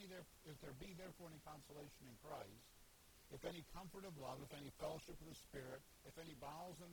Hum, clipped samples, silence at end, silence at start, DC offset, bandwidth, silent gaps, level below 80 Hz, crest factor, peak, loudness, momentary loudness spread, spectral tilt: none; under 0.1%; 0 s; 0 s; under 0.1%; 19.5 kHz; none; -70 dBFS; 20 dB; -36 dBFS; -56 LUFS; 9 LU; -4.5 dB/octave